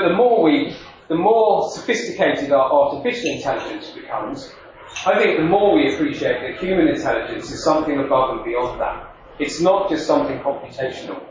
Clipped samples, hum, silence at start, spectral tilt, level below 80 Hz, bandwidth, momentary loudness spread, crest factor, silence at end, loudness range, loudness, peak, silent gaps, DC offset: under 0.1%; none; 0 s; -5 dB/octave; -48 dBFS; 7.6 kHz; 13 LU; 14 dB; 0 s; 3 LU; -19 LUFS; -4 dBFS; none; under 0.1%